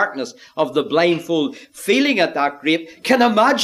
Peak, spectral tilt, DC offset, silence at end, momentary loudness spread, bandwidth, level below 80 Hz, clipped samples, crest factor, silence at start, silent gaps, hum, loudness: -2 dBFS; -4 dB/octave; under 0.1%; 0 s; 11 LU; 15 kHz; -66 dBFS; under 0.1%; 16 dB; 0 s; none; none; -18 LUFS